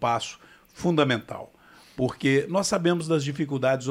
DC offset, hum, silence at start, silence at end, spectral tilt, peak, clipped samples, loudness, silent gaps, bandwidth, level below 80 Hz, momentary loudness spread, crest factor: under 0.1%; none; 0 s; 0 s; -5 dB/octave; -10 dBFS; under 0.1%; -25 LUFS; none; 15.5 kHz; -60 dBFS; 16 LU; 16 dB